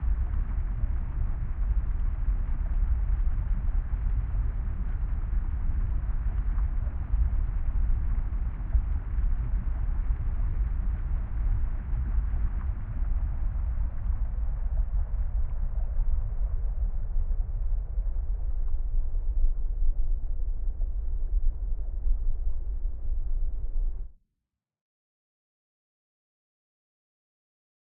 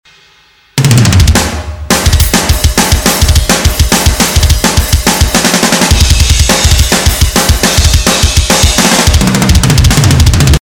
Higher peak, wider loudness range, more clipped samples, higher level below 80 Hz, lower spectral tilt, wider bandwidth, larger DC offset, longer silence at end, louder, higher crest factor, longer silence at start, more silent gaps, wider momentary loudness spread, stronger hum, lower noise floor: second, -12 dBFS vs 0 dBFS; about the same, 4 LU vs 2 LU; second, under 0.1% vs 3%; second, -28 dBFS vs -12 dBFS; first, -10 dB/octave vs -3.5 dB/octave; second, 2.5 kHz vs 19.5 kHz; neither; first, 3.85 s vs 0.05 s; second, -33 LUFS vs -7 LUFS; first, 14 dB vs 8 dB; second, 0 s vs 0.75 s; neither; about the same, 5 LU vs 3 LU; neither; first, -85 dBFS vs -44 dBFS